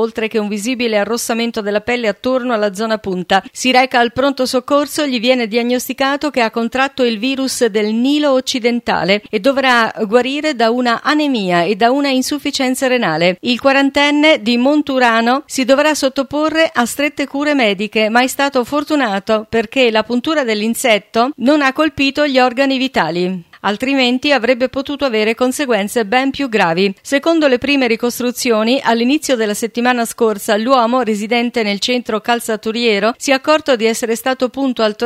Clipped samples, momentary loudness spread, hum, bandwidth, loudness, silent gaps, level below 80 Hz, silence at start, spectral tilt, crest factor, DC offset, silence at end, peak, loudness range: under 0.1%; 5 LU; none; 16 kHz; -14 LUFS; none; -54 dBFS; 0 s; -3.5 dB/octave; 14 dB; under 0.1%; 0 s; 0 dBFS; 2 LU